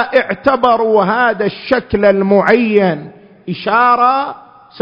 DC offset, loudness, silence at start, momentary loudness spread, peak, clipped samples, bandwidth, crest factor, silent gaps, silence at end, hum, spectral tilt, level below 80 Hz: under 0.1%; -12 LUFS; 0 s; 11 LU; 0 dBFS; under 0.1%; 6.2 kHz; 12 dB; none; 0 s; none; -8 dB/octave; -46 dBFS